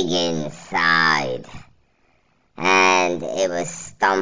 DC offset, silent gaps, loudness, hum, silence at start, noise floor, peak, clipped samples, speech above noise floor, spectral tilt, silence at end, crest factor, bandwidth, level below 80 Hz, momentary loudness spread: 0.7%; none; -19 LUFS; none; 0 s; -63 dBFS; -4 dBFS; under 0.1%; 43 dB; -3 dB/octave; 0 s; 18 dB; 7.8 kHz; -56 dBFS; 13 LU